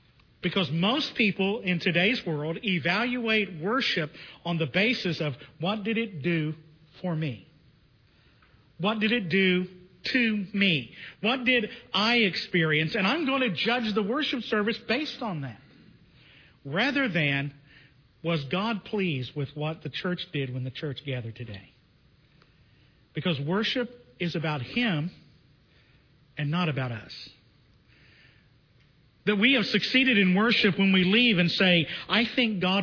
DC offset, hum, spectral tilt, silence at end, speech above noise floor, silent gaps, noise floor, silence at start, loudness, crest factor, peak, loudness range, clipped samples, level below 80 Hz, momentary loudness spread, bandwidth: under 0.1%; none; -6.5 dB/octave; 0 s; 35 dB; none; -61 dBFS; 0.45 s; -26 LUFS; 20 dB; -8 dBFS; 11 LU; under 0.1%; -64 dBFS; 13 LU; 5.4 kHz